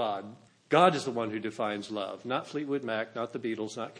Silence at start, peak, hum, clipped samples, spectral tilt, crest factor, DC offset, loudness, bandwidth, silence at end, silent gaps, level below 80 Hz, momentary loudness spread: 0 s; -8 dBFS; none; under 0.1%; -5 dB/octave; 22 dB; under 0.1%; -31 LUFS; 10.5 kHz; 0 s; none; -82 dBFS; 12 LU